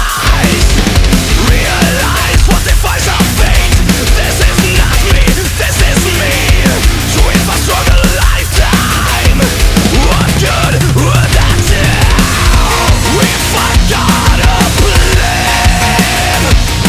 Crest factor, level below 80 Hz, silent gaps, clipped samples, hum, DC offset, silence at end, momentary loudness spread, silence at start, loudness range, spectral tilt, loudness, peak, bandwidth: 8 dB; -12 dBFS; none; 0.3%; none; under 0.1%; 0 s; 2 LU; 0 s; 1 LU; -4 dB/octave; -9 LUFS; 0 dBFS; 16 kHz